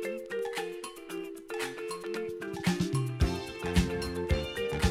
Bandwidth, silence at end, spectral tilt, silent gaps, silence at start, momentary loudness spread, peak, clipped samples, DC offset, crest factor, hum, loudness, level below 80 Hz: 16 kHz; 0 s; -5.5 dB/octave; none; 0 s; 10 LU; -12 dBFS; under 0.1%; under 0.1%; 20 dB; none; -33 LUFS; -40 dBFS